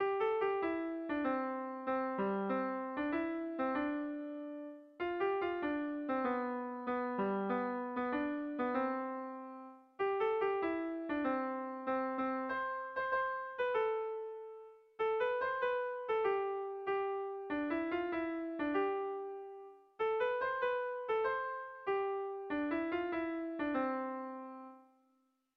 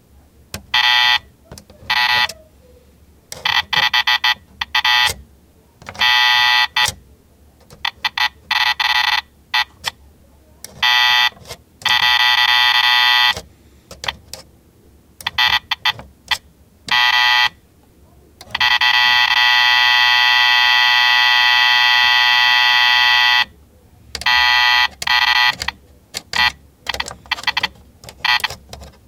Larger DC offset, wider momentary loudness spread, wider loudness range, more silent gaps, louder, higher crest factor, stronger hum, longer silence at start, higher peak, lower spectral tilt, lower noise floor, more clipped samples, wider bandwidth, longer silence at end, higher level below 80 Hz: neither; second, 10 LU vs 14 LU; second, 2 LU vs 8 LU; neither; second, -37 LUFS vs -13 LUFS; about the same, 14 dB vs 16 dB; neither; second, 0 s vs 0.55 s; second, -24 dBFS vs 0 dBFS; first, -8 dB/octave vs 1 dB/octave; first, -77 dBFS vs -50 dBFS; neither; second, 5.8 kHz vs 18 kHz; first, 0.75 s vs 0.2 s; second, -72 dBFS vs -48 dBFS